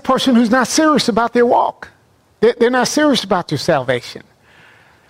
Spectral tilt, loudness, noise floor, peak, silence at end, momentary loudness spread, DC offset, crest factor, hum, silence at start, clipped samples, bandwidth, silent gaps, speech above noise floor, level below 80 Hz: -4 dB/octave; -14 LUFS; -54 dBFS; -2 dBFS; 0.9 s; 7 LU; under 0.1%; 12 dB; none; 0.05 s; under 0.1%; 16 kHz; none; 39 dB; -52 dBFS